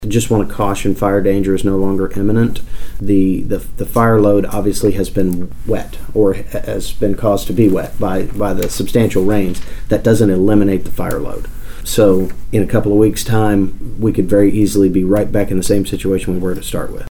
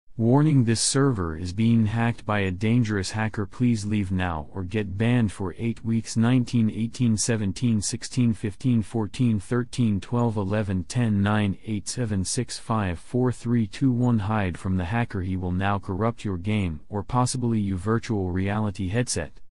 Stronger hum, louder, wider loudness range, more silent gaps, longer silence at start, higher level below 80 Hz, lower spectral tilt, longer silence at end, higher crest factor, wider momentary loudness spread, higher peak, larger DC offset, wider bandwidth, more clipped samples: neither; first, -15 LUFS vs -25 LUFS; about the same, 3 LU vs 2 LU; neither; about the same, 0 s vs 0.05 s; first, -26 dBFS vs -50 dBFS; about the same, -6.5 dB/octave vs -6 dB/octave; about the same, 0 s vs 0.05 s; about the same, 12 dB vs 16 dB; first, 10 LU vs 7 LU; first, 0 dBFS vs -8 dBFS; second, under 0.1% vs 0.9%; first, 19 kHz vs 11.5 kHz; neither